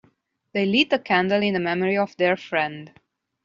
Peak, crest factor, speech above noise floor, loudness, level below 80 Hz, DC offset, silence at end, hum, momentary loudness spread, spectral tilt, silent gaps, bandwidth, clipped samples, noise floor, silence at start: -6 dBFS; 18 dB; 41 dB; -22 LUFS; -66 dBFS; under 0.1%; 0.55 s; none; 8 LU; -3 dB/octave; none; 7.4 kHz; under 0.1%; -63 dBFS; 0.55 s